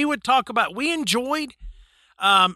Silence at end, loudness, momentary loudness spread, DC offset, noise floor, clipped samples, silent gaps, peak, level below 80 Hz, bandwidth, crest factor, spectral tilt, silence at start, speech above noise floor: 0 s; -21 LUFS; 9 LU; under 0.1%; -50 dBFS; under 0.1%; none; -2 dBFS; -48 dBFS; 15.5 kHz; 20 dB; -2.5 dB/octave; 0 s; 29 dB